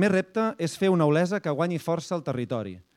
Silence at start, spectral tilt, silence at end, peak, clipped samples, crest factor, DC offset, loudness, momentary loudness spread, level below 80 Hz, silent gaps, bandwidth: 0 s; -6.5 dB/octave; 0.15 s; -10 dBFS; under 0.1%; 16 dB; under 0.1%; -26 LUFS; 8 LU; -68 dBFS; none; 15 kHz